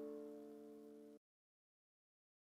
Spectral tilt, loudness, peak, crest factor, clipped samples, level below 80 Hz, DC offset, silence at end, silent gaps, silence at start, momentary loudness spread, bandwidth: -6.5 dB/octave; -57 LUFS; -42 dBFS; 16 dB; under 0.1%; under -90 dBFS; under 0.1%; 1.35 s; none; 0 s; 11 LU; 15.5 kHz